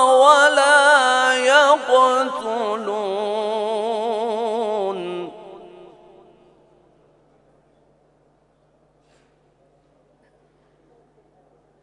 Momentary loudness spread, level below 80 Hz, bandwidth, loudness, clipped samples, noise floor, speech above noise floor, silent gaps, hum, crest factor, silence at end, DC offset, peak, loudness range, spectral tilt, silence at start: 13 LU; -70 dBFS; 11 kHz; -17 LUFS; under 0.1%; -60 dBFS; 41 dB; none; none; 20 dB; 6.15 s; under 0.1%; 0 dBFS; 16 LU; -1.5 dB/octave; 0 s